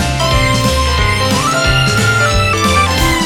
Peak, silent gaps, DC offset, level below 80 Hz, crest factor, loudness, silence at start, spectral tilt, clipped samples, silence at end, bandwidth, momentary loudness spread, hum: 0 dBFS; none; under 0.1%; -22 dBFS; 12 dB; -12 LUFS; 0 s; -4 dB/octave; under 0.1%; 0 s; 18.5 kHz; 2 LU; none